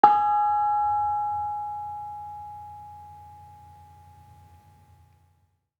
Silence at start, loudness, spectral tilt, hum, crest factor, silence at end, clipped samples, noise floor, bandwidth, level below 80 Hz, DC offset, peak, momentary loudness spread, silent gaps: 0.05 s; -25 LUFS; -6 dB/octave; none; 26 dB; 2.25 s; under 0.1%; -68 dBFS; 5 kHz; -66 dBFS; under 0.1%; -2 dBFS; 24 LU; none